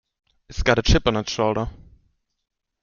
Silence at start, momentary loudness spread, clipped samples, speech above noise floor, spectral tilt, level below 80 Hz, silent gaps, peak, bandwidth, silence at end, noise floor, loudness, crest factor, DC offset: 0.5 s; 13 LU; under 0.1%; 47 dB; -5 dB/octave; -30 dBFS; none; -2 dBFS; 7.2 kHz; 1.1 s; -67 dBFS; -21 LUFS; 22 dB; under 0.1%